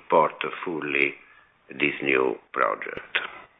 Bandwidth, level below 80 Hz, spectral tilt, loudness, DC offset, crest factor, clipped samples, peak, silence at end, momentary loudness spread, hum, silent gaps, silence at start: 4.7 kHz; -68 dBFS; -7.5 dB/octave; -25 LUFS; under 0.1%; 20 dB; under 0.1%; -6 dBFS; 0.15 s; 9 LU; none; none; 0.1 s